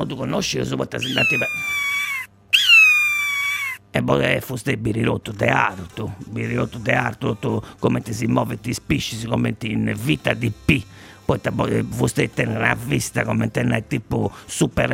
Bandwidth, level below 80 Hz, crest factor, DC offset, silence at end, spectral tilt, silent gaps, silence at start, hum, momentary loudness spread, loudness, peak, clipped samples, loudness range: 16 kHz; -44 dBFS; 20 dB; under 0.1%; 0 s; -4.5 dB/octave; none; 0 s; none; 7 LU; -20 LUFS; -2 dBFS; under 0.1%; 7 LU